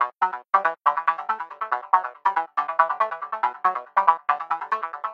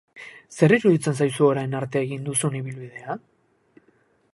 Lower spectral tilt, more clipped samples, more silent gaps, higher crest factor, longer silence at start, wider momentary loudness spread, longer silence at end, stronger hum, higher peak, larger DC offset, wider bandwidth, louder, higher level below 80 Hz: second, -3.5 dB/octave vs -6 dB/octave; neither; neither; about the same, 22 dB vs 20 dB; second, 0 s vs 0.15 s; second, 7 LU vs 18 LU; second, 0 s vs 1.2 s; neither; about the same, -2 dBFS vs -4 dBFS; neither; second, 6.6 kHz vs 11.5 kHz; about the same, -24 LUFS vs -22 LUFS; second, under -90 dBFS vs -66 dBFS